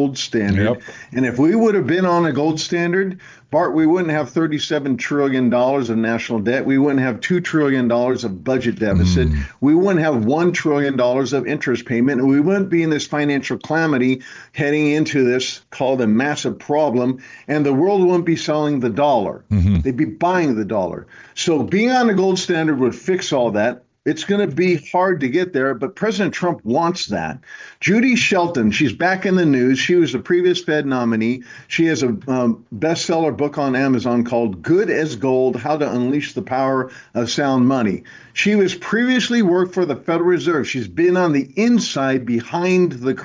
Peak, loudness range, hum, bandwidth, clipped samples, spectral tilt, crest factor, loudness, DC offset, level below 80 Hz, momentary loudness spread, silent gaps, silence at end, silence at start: -6 dBFS; 2 LU; none; 7.6 kHz; under 0.1%; -6 dB/octave; 10 dB; -18 LUFS; under 0.1%; -38 dBFS; 6 LU; none; 0 s; 0 s